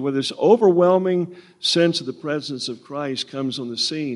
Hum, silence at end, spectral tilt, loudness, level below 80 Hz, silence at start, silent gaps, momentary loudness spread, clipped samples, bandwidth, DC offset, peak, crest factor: none; 0 s; -5 dB/octave; -20 LUFS; -72 dBFS; 0 s; none; 13 LU; under 0.1%; 11.5 kHz; under 0.1%; -2 dBFS; 18 dB